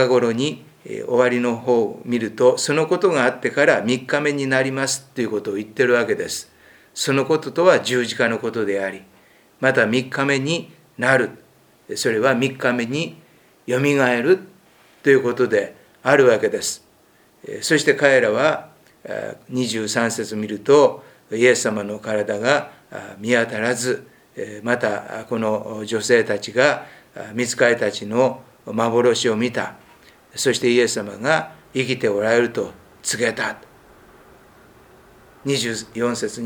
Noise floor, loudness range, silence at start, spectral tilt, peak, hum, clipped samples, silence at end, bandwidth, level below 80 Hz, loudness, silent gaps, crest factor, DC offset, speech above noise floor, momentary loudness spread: -55 dBFS; 4 LU; 0 s; -4 dB/octave; 0 dBFS; none; under 0.1%; 0 s; 20 kHz; -64 dBFS; -20 LUFS; none; 20 dB; under 0.1%; 36 dB; 14 LU